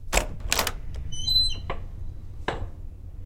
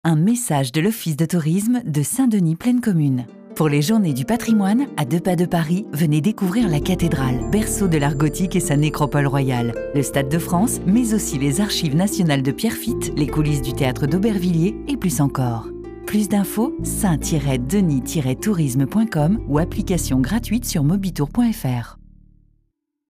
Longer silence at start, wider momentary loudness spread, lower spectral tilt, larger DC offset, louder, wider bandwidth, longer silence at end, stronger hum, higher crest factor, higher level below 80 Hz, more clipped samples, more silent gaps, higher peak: about the same, 0 s vs 0.05 s; first, 20 LU vs 4 LU; second, -2 dB/octave vs -6 dB/octave; neither; second, -27 LUFS vs -20 LUFS; about the same, 17 kHz vs 15.5 kHz; second, 0 s vs 1.15 s; neither; first, 28 dB vs 12 dB; about the same, -34 dBFS vs -36 dBFS; neither; neither; first, 0 dBFS vs -8 dBFS